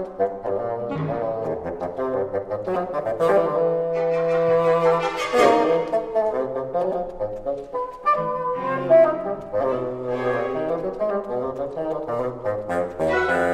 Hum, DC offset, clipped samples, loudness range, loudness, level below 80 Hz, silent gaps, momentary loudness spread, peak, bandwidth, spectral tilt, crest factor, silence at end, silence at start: none; 0.1%; under 0.1%; 6 LU; -23 LUFS; -50 dBFS; none; 10 LU; -4 dBFS; 12 kHz; -6.5 dB/octave; 18 dB; 0 s; 0 s